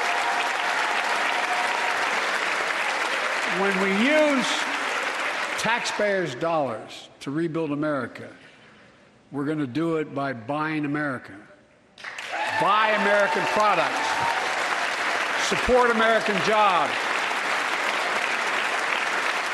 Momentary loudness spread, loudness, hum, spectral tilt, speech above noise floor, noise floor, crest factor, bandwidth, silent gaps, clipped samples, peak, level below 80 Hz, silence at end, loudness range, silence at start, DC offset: 9 LU; -23 LUFS; none; -3.5 dB/octave; 30 dB; -54 dBFS; 18 dB; 12.5 kHz; none; under 0.1%; -8 dBFS; -56 dBFS; 0 s; 8 LU; 0 s; under 0.1%